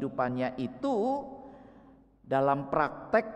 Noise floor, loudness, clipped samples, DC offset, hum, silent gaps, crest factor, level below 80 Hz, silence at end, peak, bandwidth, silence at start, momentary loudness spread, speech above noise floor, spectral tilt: -57 dBFS; -30 LUFS; under 0.1%; under 0.1%; none; none; 20 dB; -62 dBFS; 0 s; -12 dBFS; 9.6 kHz; 0 s; 14 LU; 27 dB; -8 dB/octave